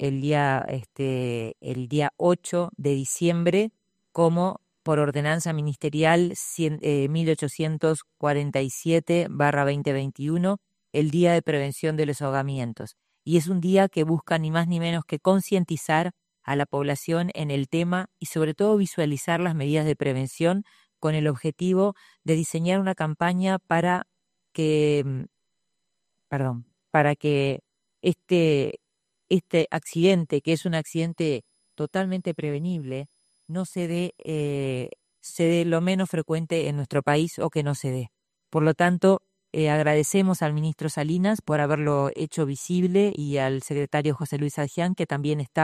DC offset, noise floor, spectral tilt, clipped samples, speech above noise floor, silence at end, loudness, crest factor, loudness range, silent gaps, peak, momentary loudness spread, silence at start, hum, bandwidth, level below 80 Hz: under 0.1%; -81 dBFS; -6 dB/octave; under 0.1%; 57 dB; 0 s; -25 LUFS; 20 dB; 3 LU; none; -6 dBFS; 9 LU; 0 s; none; 15 kHz; -64 dBFS